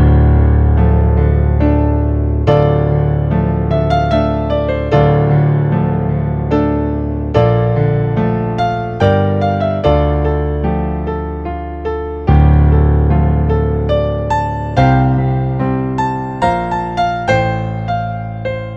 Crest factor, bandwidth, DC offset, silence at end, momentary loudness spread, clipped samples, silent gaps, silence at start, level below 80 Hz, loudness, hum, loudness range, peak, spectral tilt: 12 dB; 6.8 kHz; under 0.1%; 0 s; 8 LU; under 0.1%; none; 0 s; -18 dBFS; -14 LUFS; none; 3 LU; 0 dBFS; -9 dB/octave